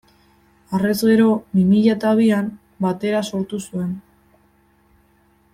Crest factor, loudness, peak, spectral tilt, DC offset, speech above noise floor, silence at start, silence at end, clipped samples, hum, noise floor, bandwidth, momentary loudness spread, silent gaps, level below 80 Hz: 16 dB; -19 LUFS; -4 dBFS; -7 dB/octave; under 0.1%; 40 dB; 0.7 s; 1.55 s; under 0.1%; none; -58 dBFS; 14.5 kHz; 12 LU; none; -58 dBFS